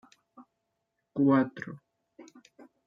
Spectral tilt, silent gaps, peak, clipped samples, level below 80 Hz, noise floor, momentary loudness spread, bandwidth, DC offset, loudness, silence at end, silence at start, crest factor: -8.5 dB/octave; none; -12 dBFS; under 0.1%; -78 dBFS; -82 dBFS; 19 LU; 7 kHz; under 0.1%; -27 LUFS; 0.65 s; 0.4 s; 20 dB